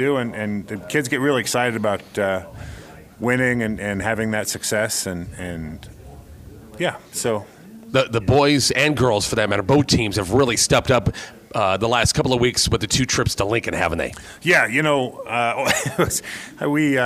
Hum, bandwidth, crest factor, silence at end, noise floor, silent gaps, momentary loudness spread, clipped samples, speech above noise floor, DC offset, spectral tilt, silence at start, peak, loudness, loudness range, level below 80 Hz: none; 16 kHz; 18 dB; 0 s; -41 dBFS; none; 12 LU; under 0.1%; 21 dB; under 0.1%; -4 dB/octave; 0 s; -4 dBFS; -20 LUFS; 7 LU; -42 dBFS